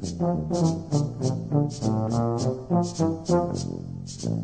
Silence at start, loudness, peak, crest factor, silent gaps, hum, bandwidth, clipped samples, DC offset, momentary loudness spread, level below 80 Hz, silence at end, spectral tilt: 0 s; -26 LUFS; -10 dBFS; 16 dB; none; none; 9.4 kHz; under 0.1%; 0.1%; 7 LU; -50 dBFS; 0 s; -7.5 dB/octave